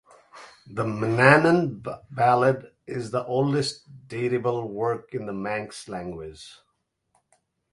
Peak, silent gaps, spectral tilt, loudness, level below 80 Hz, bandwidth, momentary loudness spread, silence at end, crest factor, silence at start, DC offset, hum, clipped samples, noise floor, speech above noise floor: 0 dBFS; none; -6 dB/octave; -24 LUFS; -60 dBFS; 11.5 kHz; 19 LU; 1.2 s; 24 dB; 0.35 s; under 0.1%; none; under 0.1%; -72 dBFS; 48 dB